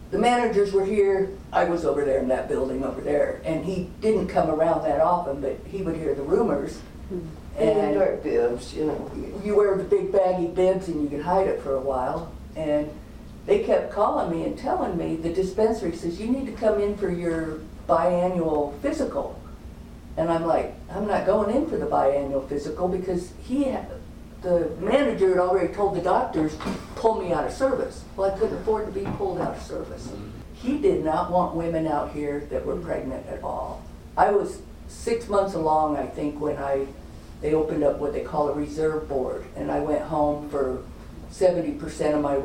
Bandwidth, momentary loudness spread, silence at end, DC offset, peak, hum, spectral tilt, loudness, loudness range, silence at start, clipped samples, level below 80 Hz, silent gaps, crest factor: 15.5 kHz; 12 LU; 0 s; under 0.1%; -4 dBFS; none; -7 dB/octave; -25 LUFS; 3 LU; 0 s; under 0.1%; -44 dBFS; none; 20 dB